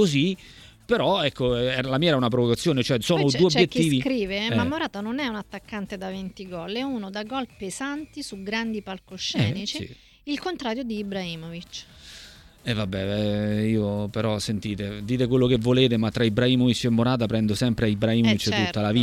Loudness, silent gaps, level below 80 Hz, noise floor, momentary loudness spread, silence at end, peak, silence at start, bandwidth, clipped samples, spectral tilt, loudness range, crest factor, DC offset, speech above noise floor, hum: -24 LUFS; none; -50 dBFS; -47 dBFS; 15 LU; 0 s; -4 dBFS; 0 s; 16 kHz; under 0.1%; -5.5 dB/octave; 9 LU; 20 dB; under 0.1%; 23 dB; none